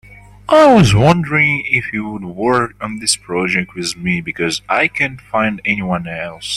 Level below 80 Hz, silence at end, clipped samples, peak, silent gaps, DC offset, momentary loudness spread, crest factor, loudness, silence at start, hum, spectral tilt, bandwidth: -40 dBFS; 0 s; under 0.1%; 0 dBFS; none; under 0.1%; 13 LU; 16 dB; -15 LUFS; 0.1 s; none; -5 dB/octave; 13 kHz